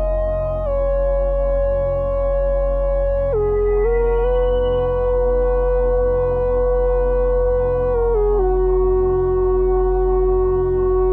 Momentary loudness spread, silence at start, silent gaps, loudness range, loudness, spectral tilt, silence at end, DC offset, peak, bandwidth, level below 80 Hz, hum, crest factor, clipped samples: 3 LU; 0 s; none; 2 LU; -18 LUFS; -11 dB/octave; 0 s; under 0.1%; -8 dBFS; 3.2 kHz; -22 dBFS; none; 8 dB; under 0.1%